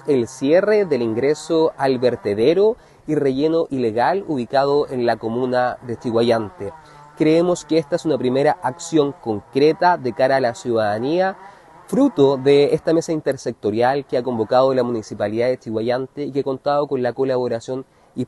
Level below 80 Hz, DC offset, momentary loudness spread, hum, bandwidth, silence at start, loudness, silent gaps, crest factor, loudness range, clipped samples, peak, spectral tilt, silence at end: -56 dBFS; under 0.1%; 8 LU; none; 12 kHz; 0.05 s; -19 LUFS; none; 16 dB; 2 LU; under 0.1%; -2 dBFS; -6 dB/octave; 0 s